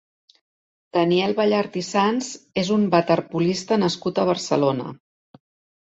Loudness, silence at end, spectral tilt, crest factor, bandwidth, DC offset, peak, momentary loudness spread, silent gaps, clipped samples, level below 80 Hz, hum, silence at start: -21 LUFS; 0.9 s; -5.5 dB/octave; 18 dB; 8 kHz; under 0.1%; -4 dBFS; 7 LU; none; under 0.1%; -62 dBFS; none; 0.95 s